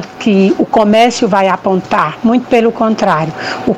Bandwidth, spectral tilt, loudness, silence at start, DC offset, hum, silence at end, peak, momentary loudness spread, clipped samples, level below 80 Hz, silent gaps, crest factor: 10.5 kHz; -6 dB/octave; -11 LUFS; 0 s; under 0.1%; none; 0 s; 0 dBFS; 5 LU; under 0.1%; -48 dBFS; none; 10 dB